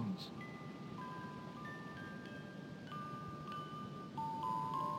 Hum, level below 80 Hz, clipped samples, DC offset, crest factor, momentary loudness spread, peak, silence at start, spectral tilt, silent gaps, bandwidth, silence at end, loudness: none; -74 dBFS; under 0.1%; under 0.1%; 16 dB; 9 LU; -30 dBFS; 0 s; -6.5 dB/octave; none; 16.5 kHz; 0 s; -46 LUFS